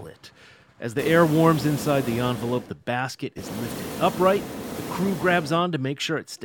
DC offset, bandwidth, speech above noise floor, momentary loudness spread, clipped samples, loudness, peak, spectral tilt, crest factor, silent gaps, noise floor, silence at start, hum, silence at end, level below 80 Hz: under 0.1%; 19 kHz; 29 dB; 13 LU; under 0.1%; -24 LUFS; -4 dBFS; -5.5 dB/octave; 20 dB; none; -52 dBFS; 0 s; none; 0 s; -54 dBFS